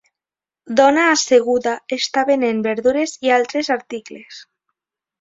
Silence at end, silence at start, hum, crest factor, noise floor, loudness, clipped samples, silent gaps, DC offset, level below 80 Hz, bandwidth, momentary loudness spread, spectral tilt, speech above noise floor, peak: 0.8 s; 0.65 s; none; 18 dB; -90 dBFS; -17 LUFS; under 0.1%; none; under 0.1%; -62 dBFS; 7.8 kHz; 12 LU; -2.5 dB/octave; 73 dB; 0 dBFS